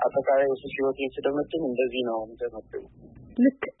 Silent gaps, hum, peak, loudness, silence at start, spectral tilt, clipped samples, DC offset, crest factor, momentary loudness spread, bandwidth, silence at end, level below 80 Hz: none; none; -10 dBFS; -27 LUFS; 0 s; -9.5 dB/octave; under 0.1%; under 0.1%; 18 dB; 13 LU; 4 kHz; 0.1 s; -58 dBFS